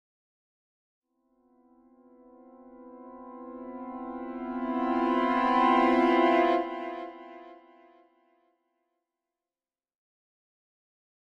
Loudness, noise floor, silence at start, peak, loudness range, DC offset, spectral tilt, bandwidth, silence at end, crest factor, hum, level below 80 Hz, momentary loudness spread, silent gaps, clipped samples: -26 LUFS; under -90 dBFS; 2.6 s; -10 dBFS; 20 LU; under 0.1%; -5.5 dB/octave; 7.8 kHz; 3.8 s; 20 dB; none; -66 dBFS; 24 LU; none; under 0.1%